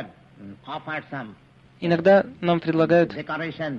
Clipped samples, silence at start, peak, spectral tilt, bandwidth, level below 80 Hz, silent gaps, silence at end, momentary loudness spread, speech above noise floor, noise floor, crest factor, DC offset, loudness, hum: under 0.1%; 0 s; -6 dBFS; -8 dB/octave; 7 kHz; -60 dBFS; none; 0 s; 18 LU; 22 dB; -44 dBFS; 16 dB; under 0.1%; -22 LUFS; none